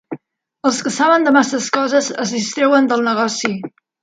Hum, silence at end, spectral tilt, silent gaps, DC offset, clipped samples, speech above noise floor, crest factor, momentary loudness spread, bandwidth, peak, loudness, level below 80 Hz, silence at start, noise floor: none; 0.35 s; -3.5 dB/octave; none; under 0.1%; under 0.1%; 27 dB; 16 dB; 12 LU; 9.4 kHz; 0 dBFS; -16 LUFS; -68 dBFS; 0.1 s; -42 dBFS